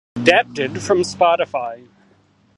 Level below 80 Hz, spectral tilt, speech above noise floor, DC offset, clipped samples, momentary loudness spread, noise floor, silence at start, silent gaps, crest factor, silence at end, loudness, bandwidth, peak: -56 dBFS; -4 dB/octave; 38 dB; under 0.1%; under 0.1%; 10 LU; -56 dBFS; 0.15 s; none; 20 dB; 0.8 s; -17 LUFS; 11.5 kHz; 0 dBFS